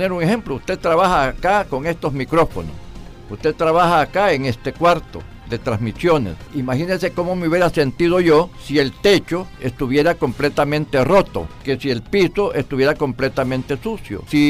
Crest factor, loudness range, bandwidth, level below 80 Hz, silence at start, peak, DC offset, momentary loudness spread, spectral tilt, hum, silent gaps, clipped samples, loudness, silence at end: 12 dB; 2 LU; 15.5 kHz; -38 dBFS; 0 s; -6 dBFS; under 0.1%; 11 LU; -6 dB/octave; none; none; under 0.1%; -18 LUFS; 0 s